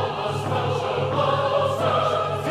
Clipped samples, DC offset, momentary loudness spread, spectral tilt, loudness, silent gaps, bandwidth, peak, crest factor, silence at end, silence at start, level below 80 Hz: under 0.1%; under 0.1%; 4 LU; -6 dB/octave; -23 LUFS; none; 14 kHz; -8 dBFS; 14 dB; 0 s; 0 s; -56 dBFS